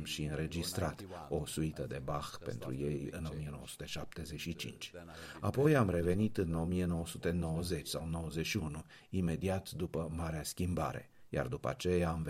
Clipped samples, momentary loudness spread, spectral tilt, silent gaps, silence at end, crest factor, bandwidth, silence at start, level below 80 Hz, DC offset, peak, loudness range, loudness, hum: under 0.1%; 11 LU; -6 dB/octave; none; 0 s; 20 dB; 16 kHz; 0 s; -52 dBFS; under 0.1%; -18 dBFS; 7 LU; -37 LUFS; none